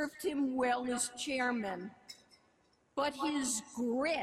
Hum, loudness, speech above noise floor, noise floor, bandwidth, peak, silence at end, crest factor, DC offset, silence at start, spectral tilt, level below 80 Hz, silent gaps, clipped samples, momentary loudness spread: none; -35 LUFS; 37 dB; -72 dBFS; 15 kHz; -22 dBFS; 0 s; 14 dB; under 0.1%; 0 s; -2.5 dB/octave; -72 dBFS; none; under 0.1%; 14 LU